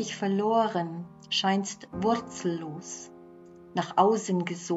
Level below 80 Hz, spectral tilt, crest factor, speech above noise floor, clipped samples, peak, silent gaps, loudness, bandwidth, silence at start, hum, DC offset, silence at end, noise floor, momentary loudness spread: -66 dBFS; -4.5 dB/octave; 20 dB; 22 dB; under 0.1%; -8 dBFS; none; -28 LUFS; 8 kHz; 0 s; none; under 0.1%; 0 s; -50 dBFS; 15 LU